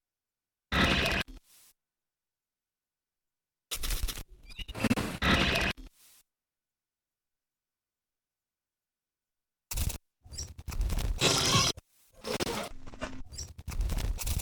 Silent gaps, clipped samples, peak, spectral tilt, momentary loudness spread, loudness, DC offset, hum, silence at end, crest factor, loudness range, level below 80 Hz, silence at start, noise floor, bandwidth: none; under 0.1%; -10 dBFS; -3 dB/octave; 18 LU; -30 LUFS; under 0.1%; none; 0 s; 24 dB; 12 LU; -40 dBFS; 0.7 s; under -90 dBFS; over 20 kHz